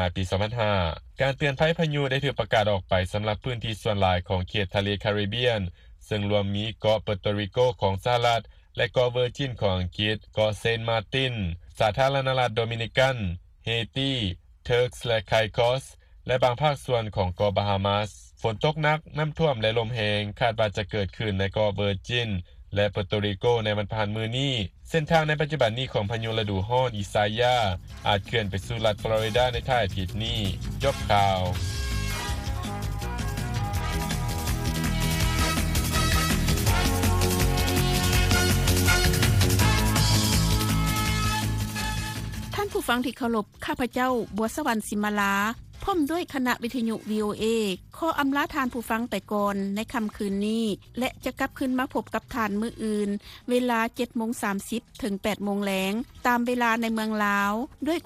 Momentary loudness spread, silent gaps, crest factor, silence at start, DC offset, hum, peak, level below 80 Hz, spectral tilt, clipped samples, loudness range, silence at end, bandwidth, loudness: 8 LU; none; 20 dB; 0 s; under 0.1%; none; -6 dBFS; -38 dBFS; -5 dB/octave; under 0.1%; 5 LU; 0.05 s; 15.5 kHz; -26 LUFS